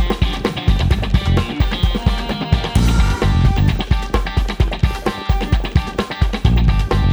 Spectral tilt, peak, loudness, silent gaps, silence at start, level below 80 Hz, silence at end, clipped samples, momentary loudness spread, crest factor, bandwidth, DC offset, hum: -6.5 dB/octave; 0 dBFS; -18 LUFS; none; 0 s; -18 dBFS; 0 s; under 0.1%; 5 LU; 16 dB; over 20 kHz; under 0.1%; none